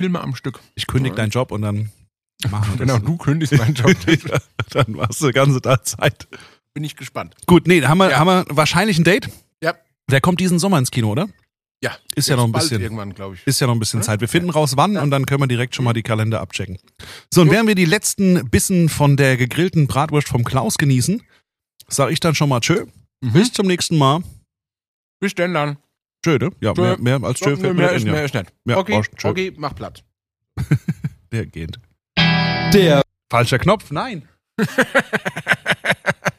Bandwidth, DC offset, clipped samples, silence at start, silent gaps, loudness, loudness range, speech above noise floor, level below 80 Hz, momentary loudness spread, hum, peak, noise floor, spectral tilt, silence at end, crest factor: 15.5 kHz; under 0.1%; under 0.1%; 0 s; 11.71-11.75 s, 24.88-25.20 s; -17 LUFS; 5 LU; 49 dB; -44 dBFS; 14 LU; none; 0 dBFS; -66 dBFS; -5 dB/octave; 0.05 s; 18 dB